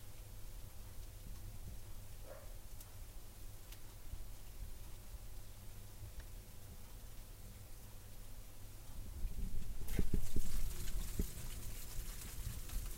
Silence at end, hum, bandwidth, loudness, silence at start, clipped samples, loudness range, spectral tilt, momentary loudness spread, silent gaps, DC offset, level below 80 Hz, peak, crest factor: 0 s; none; 16 kHz; -50 LUFS; 0 s; under 0.1%; 9 LU; -4.5 dB/octave; 11 LU; none; under 0.1%; -46 dBFS; -20 dBFS; 20 dB